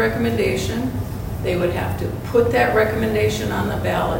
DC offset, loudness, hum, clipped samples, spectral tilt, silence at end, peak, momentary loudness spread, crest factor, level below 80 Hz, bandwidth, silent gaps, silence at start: under 0.1%; -20 LUFS; none; under 0.1%; -6 dB/octave; 0 s; -4 dBFS; 9 LU; 16 dB; -34 dBFS; 16.5 kHz; none; 0 s